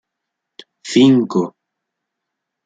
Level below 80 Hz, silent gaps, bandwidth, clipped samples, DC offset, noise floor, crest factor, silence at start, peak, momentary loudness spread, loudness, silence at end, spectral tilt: -64 dBFS; none; 9.2 kHz; under 0.1%; under 0.1%; -79 dBFS; 16 dB; 0.85 s; -2 dBFS; 16 LU; -14 LUFS; 1.15 s; -6 dB/octave